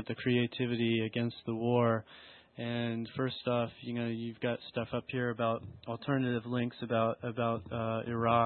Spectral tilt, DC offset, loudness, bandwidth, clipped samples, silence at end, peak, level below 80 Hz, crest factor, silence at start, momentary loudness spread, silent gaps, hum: -10.5 dB/octave; under 0.1%; -34 LUFS; 4.4 kHz; under 0.1%; 0 s; -14 dBFS; -68 dBFS; 18 dB; 0 s; 7 LU; none; none